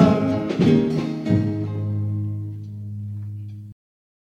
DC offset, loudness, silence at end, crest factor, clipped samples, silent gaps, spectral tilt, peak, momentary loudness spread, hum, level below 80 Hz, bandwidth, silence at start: under 0.1%; -23 LUFS; 0.65 s; 20 dB; under 0.1%; none; -8.5 dB/octave; -2 dBFS; 16 LU; none; -52 dBFS; 8.2 kHz; 0 s